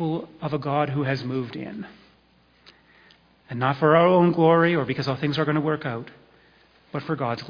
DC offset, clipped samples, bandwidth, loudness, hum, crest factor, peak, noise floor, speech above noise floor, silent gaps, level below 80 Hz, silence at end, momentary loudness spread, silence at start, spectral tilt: under 0.1%; under 0.1%; 5.2 kHz; -23 LUFS; none; 20 dB; -4 dBFS; -60 dBFS; 37 dB; none; -62 dBFS; 0 s; 17 LU; 0 s; -8.5 dB/octave